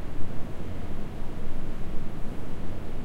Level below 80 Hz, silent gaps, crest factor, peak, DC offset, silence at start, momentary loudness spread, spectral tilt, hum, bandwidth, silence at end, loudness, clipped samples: -32 dBFS; none; 12 dB; -10 dBFS; under 0.1%; 0 s; 1 LU; -7.5 dB/octave; none; 4.1 kHz; 0 s; -38 LUFS; under 0.1%